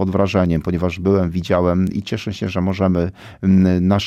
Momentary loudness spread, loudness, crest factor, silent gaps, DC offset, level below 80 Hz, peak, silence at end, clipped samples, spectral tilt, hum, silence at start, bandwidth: 8 LU; -18 LUFS; 12 dB; none; under 0.1%; -40 dBFS; -4 dBFS; 0 s; under 0.1%; -8 dB/octave; none; 0 s; 7.6 kHz